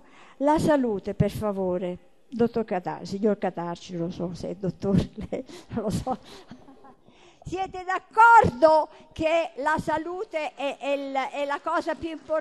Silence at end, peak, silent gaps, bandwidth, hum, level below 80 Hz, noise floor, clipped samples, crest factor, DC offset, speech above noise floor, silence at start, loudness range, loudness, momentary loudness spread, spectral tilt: 0 s; -6 dBFS; none; 12.5 kHz; none; -50 dBFS; -55 dBFS; under 0.1%; 20 dB; 0.2%; 30 dB; 0.4 s; 10 LU; -25 LUFS; 14 LU; -6.5 dB/octave